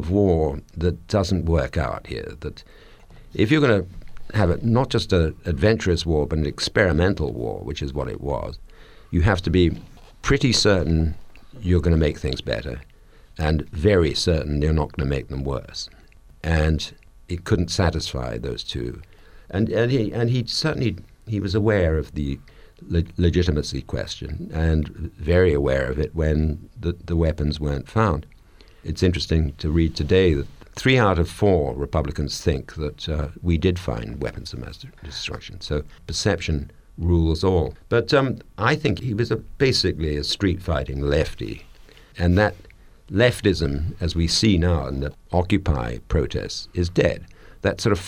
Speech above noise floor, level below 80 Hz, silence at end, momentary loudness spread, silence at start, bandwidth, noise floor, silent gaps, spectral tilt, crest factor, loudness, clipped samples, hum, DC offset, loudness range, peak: 27 dB; -32 dBFS; 0 s; 12 LU; 0 s; 12 kHz; -49 dBFS; none; -6 dB/octave; 20 dB; -22 LUFS; under 0.1%; none; under 0.1%; 4 LU; -2 dBFS